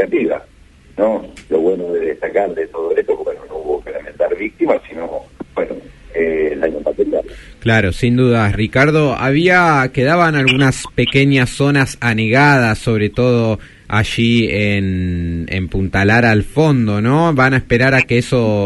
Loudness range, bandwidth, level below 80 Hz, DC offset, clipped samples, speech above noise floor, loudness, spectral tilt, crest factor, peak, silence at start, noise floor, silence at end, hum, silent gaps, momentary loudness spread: 7 LU; 11.5 kHz; -36 dBFS; under 0.1%; under 0.1%; 30 dB; -15 LUFS; -6.5 dB/octave; 14 dB; 0 dBFS; 0 s; -44 dBFS; 0 s; none; none; 11 LU